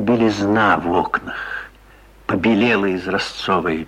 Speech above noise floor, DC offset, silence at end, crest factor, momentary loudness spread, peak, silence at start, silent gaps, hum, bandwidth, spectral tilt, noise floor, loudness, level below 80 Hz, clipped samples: 29 dB; under 0.1%; 0 s; 18 dB; 12 LU; -2 dBFS; 0 s; none; none; 11.5 kHz; -6 dB/octave; -46 dBFS; -18 LUFS; -46 dBFS; under 0.1%